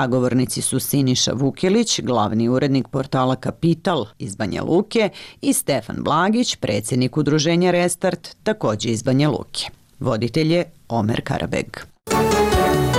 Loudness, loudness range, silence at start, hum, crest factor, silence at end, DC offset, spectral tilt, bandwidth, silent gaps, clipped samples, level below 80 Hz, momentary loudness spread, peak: -20 LUFS; 2 LU; 0 s; none; 12 dB; 0 s; under 0.1%; -5 dB/octave; 16 kHz; none; under 0.1%; -42 dBFS; 8 LU; -8 dBFS